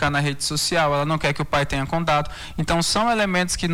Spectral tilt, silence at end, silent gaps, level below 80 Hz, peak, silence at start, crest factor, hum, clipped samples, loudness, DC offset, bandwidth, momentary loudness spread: -4 dB/octave; 0 s; none; -38 dBFS; -8 dBFS; 0 s; 12 dB; none; under 0.1%; -21 LUFS; under 0.1%; 19 kHz; 4 LU